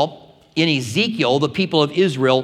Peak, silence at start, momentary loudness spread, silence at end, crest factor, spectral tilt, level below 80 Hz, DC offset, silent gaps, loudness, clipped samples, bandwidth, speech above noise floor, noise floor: 0 dBFS; 0 s; 4 LU; 0 s; 18 dB; -5.5 dB/octave; -62 dBFS; under 0.1%; none; -18 LUFS; under 0.1%; 14.5 kHz; 22 dB; -40 dBFS